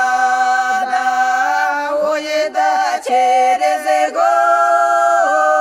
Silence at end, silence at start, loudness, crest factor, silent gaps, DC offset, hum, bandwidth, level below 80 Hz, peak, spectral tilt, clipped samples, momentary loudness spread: 0 s; 0 s; -14 LUFS; 10 dB; none; under 0.1%; none; 14 kHz; -64 dBFS; -4 dBFS; -0.5 dB/octave; under 0.1%; 5 LU